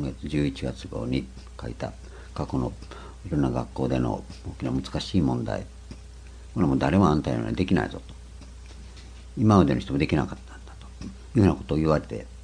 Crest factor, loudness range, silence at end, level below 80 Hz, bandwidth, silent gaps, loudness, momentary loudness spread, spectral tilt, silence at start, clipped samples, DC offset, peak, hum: 22 dB; 6 LU; 0 s; -40 dBFS; 10.5 kHz; none; -26 LUFS; 23 LU; -7.5 dB/octave; 0 s; under 0.1%; under 0.1%; -4 dBFS; none